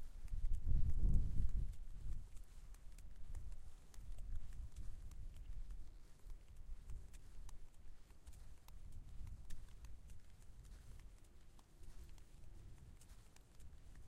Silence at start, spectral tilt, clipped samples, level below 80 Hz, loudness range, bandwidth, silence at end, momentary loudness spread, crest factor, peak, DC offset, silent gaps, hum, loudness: 0 s; -6.5 dB/octave; under 0.1%; -46 dBFS; 16 LU; 9.8 kHz; 0 s; 21 LU; 20 dB; -22 dBFS; under 0.1%; none; none; -52 LUFS